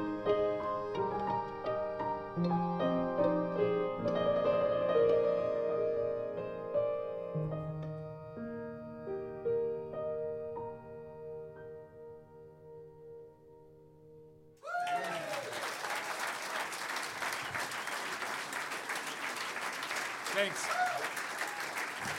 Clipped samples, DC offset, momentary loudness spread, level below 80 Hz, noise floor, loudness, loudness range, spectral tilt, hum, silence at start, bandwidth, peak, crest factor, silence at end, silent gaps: under 0.1%; under 0.1%; 16 LU; -66 dBFS; -57 dBFS; -35 LUFS; 13 LU; -4.5 dB/octave; none; 0 s; 16.5 kHz; -18 dBFS; 18 dB; 0 s; none